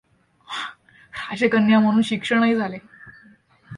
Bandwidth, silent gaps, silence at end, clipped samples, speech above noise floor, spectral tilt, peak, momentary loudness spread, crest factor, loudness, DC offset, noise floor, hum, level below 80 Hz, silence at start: 10.5 kHz; none; 0 s; under 0.1%; 35 dB; -6 dB/octave; -6 dBFS; 18 LU; 16 dB; -20 LUFS; under 0.1%; -53 dBFS; none; -62 dBFS; 0.5 s